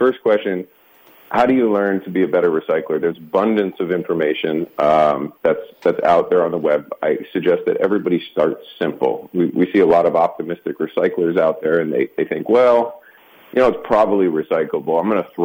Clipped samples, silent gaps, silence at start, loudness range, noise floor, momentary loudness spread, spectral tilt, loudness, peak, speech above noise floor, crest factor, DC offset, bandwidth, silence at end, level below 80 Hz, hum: under 0.1%; none; 0 s; 1 LU; -48 dBFS; 7 LU; -7.5 dB/octave; -18 LUFS; -4 dBFS; 31 dB; 12 dB; under 0.1%; 16.5 kHz; 0 s; -56 dBFS; none